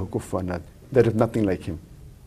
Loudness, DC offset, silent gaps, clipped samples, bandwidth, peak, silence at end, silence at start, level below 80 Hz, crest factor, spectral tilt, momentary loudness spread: -24 LUFS; under 0.1%; none; under 0.1%; 14.5 kHz; -4 dBFS; 0 s; 0 s; -48 dBFS; 20 dB; -8 dB/octave; 14 LU